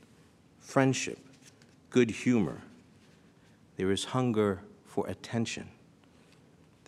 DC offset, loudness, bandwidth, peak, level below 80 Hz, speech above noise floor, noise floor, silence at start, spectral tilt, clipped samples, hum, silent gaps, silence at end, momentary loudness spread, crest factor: under 0.1%; -31 LUFS; 12.5 kHz; -10 dBFS; -68 dBFS; 31 dB; -60 dBFS; 0.65 s; -5.5 dB/octave; under 0.1%; none; none; 1.2 s; 14 LU; 24 dB